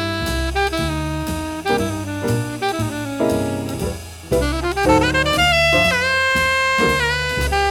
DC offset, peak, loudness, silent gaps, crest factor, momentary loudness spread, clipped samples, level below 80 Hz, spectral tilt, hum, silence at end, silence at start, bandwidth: under 0.1%; -2 dBFS; -18 LUFS; none; 18 dB; 10 LU; under 0.1%; -30 dBFS; -4.5 dB/octave; none; 0 s; 0 s; 18 kHz